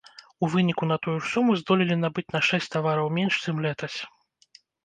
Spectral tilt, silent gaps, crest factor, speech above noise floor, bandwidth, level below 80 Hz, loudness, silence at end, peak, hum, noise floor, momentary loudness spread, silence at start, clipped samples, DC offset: -6 dB/octave; none; 20 dB; 33 dB; 9.4 kHz; -66 dBFS; -25 LUFS; 0.8 s; -6 dBFS; none; -58 dBFS; 8 LU; 0.4 s; under 0.1%; under 0.1%